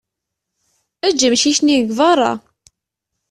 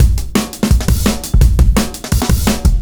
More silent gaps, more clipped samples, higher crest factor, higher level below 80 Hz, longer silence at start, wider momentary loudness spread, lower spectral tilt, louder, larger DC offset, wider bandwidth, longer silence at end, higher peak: neither; neither; about the same, 16 dB vs 12 dB; second, -58 dBFS vs -14 dBFS; first, 1.05 s vs 0 s; about the same, 7 LU vs 5 LU; second, -2 dB/octave vs -5.5 dB/octave; about the same, -14 LUFS vs -14 LUFS; neither; second, 12.5 kHz vs over 20 kHz; first, 0.95 s vs 0 s; about the same, -2 dBFS vs 0 dBFS